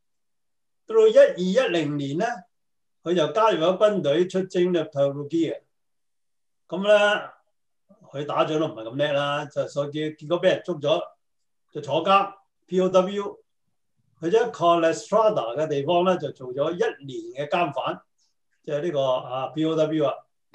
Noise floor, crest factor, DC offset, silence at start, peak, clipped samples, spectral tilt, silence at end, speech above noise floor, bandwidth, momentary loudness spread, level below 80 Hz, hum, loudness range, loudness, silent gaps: -87 dBFS; 18 dB; under 0.1%; 0.9 s; -6 dBFS; under 0.1%; -5.5 dB/octave; 0.35 s; 64 dB; 9.2 kHz; 13 LU; -76 dBFS; none; 4 LU; -23 LUFS; none